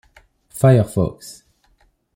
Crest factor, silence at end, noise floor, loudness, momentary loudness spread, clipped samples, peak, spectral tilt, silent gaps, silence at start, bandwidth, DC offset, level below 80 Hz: 18 dB; 0.85 s; -60 dBFS; -17 LUFS; 23 LU; under 0.1%; -2 dBFS; -7.5 dB/octave; none; 0.55 s; 16.5 kHz; under 0.1%; -48 dBFS